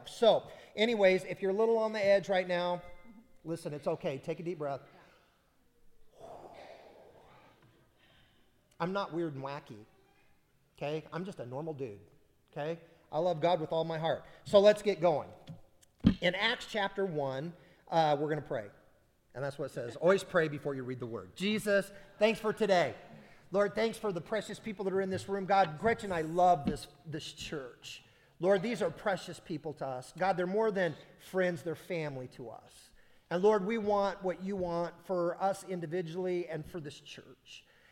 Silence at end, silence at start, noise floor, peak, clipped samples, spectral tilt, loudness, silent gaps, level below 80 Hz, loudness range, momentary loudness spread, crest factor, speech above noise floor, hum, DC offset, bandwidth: 0.3 s; 0 s; -69 dBFS; -10 dBFS; under 0.1%; -5.5 dB/octave; -33 LUFS; none; -60 dBFS; 12 LU; 18 LU; 24 dB; 37 dB; none; under 0.1%; 16 kHz